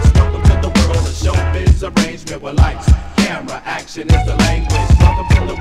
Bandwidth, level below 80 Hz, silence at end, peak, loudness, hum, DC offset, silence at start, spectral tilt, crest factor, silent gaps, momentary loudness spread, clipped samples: 12.5 kHz; -16 dBFS; 0 s; 0 dBFS; -15 LUFS; none; under 0.1%; 0 s; -6 dB/octave; 12 dB; none; 11 LU; 0.4%